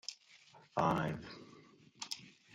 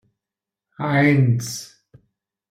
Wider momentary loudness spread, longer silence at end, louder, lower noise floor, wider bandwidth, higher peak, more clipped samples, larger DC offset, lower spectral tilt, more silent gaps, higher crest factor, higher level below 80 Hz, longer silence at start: first, 25 LU vs 14 LU; second, 0.25 s vs 0.85 s; second, -39 LUFS vs -19 LUFS; second, -63 dBFS vs -88 dBFS; about the same, 15 kHz vs 15.5 kHz; second, -18 dBFS vs -6 dBFS; neither; neither; about the same, -5 dB/octave vs -6 dB/octave; neither; first, 22 dB vs 16 dB; second, -68 dBFS vs -62 dBFS; second, 0.05 s vs 0.8 s